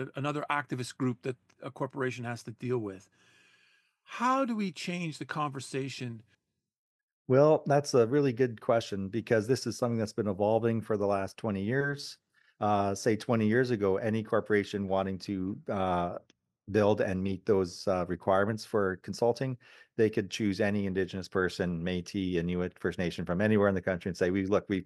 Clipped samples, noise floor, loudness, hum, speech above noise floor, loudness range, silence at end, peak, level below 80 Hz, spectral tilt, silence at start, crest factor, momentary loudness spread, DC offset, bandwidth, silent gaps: under 0.1%; -68 dBFS; -30 LUFS; none; 38 dB; 6 LU; 0 s; -10 dBFS; -64 dBFS; -6.5 dB/octave; 0 s; 20 dB; 11 LU; under 0.1%; 12.5 kHz; 6.78-7.25 s